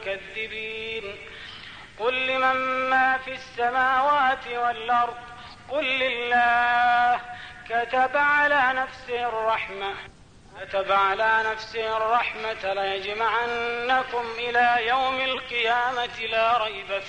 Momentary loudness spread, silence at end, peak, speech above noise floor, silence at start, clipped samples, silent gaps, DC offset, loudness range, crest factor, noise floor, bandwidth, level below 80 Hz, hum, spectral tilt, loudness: 12 LU; 0 s; -10 dBFS; 22 dB; 0 s; under 0.1%; none; 0.1%; 3 LU; 14 dB; -45 dBFS; 9.6 kHz; -56 dBFS; none; -3 dB/octave; -23 LUFS